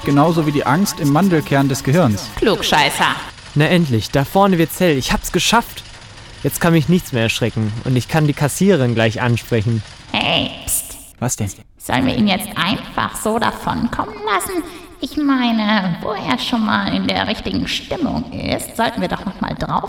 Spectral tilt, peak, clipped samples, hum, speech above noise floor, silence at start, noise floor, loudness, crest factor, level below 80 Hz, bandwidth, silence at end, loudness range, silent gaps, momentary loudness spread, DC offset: -5 dB/octave; 0 dBFS; under 0.1%; none; 20 dB; 0 s; -37 dBFS; -17 LUFS; 18 dB; -38 dBFS; 18 kHz; 0 s; 4 LU; none; 9 LU; under 0.1%